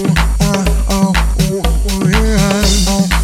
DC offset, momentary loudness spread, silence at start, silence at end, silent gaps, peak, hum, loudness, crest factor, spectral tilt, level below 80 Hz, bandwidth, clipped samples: under 0.1%; 3 LU; 0 s; 0 s; none; 0 dBFS; none; -13 LUFS; 12 dB; -4.5 dB/octave; -16 dBFS; 16 kHz; under 0.1%